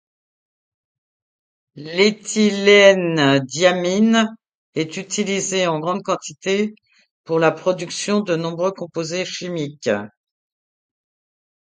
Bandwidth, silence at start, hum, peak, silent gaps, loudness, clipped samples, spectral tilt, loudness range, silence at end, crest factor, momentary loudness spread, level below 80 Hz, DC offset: 9.6 kHz; 1.75 s; none; 0 dBFS; 4.55-4.73 s, 7.11-7.24 s; -18 LUFS; under 0.1%; -4 dB/octave; 8 LU; 1.55 s; 20 dB; 12 LU; -68 dBFS; under 0.1%